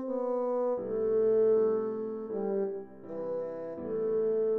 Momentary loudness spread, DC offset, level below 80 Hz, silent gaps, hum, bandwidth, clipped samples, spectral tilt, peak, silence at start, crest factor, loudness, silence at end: 12 LU; 0.1%; -66 dBFS; none; none; 2.4 kHz; under 0.1%; -10.5 dB/octave; -20 dBFS; 0 s; 10 dB; -31 LUFS; 0 s